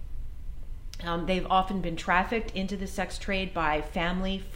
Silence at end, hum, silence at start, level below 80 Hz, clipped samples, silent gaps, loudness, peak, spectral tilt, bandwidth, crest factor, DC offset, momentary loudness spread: 0 s; none; 0 s; -38 dBFS; under 0.1%; none; -29 LUFS; -10 dBFS; -5 dB/octave; 16 kHz; 20 dB; under 0.1%; 18 LU